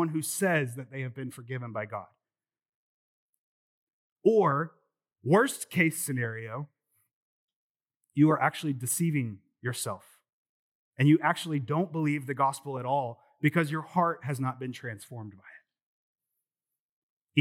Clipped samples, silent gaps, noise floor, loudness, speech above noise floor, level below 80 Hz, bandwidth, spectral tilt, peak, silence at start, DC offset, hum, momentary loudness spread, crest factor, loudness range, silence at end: under 0.1%; 2.69-3.87 s, 3.93-4.16 s, 7.13-7.48 s, 7.56-7.80 s, 7.96-8.00 s, 10.33-10.92 s, 15.82-16.15 s, 16.80-17.27 s; under -90 dBFS; -29 LUFS; over 61 dB; -88 dBFS; 17 kHz; -5.5 dB/octave; -8 dBFS; 0 s; under 0.1%; none; 15 LU; 22 dB; 7 LU; 0 s